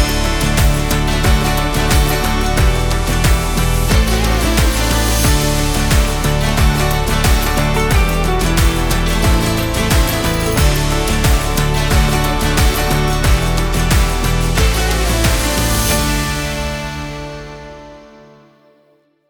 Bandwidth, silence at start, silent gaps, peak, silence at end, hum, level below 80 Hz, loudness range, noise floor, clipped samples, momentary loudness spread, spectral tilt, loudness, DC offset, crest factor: over 20 kHz; 0 s; none; 0 dBFS; 1.25 s; none; -18 dBFS; 2 LU; -55 dBFS; under 0.1%; 3 LU; -4.5 dB/octave; -15 LUFS; under 0.1%; 14 dB